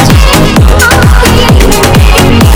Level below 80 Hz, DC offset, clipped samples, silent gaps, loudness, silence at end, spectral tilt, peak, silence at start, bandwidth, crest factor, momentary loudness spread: -8 dBFS; under 0.1%; 30%; none; -4 LUFS; 0 s; -5 dB/octave; 0 dBFS; 0 s; over 20 kHz; 2 dB; 1 LU